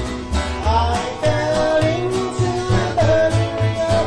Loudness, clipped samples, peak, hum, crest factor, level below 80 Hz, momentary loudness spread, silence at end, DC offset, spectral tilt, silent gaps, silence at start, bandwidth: -19 LUFS; under 0.1%; -6 dBFS; none; 12 dB; -30 dBFS; 5 LU; 0 s; under 0.1%; -6 dB/octave; none; 0 s; 11 kHz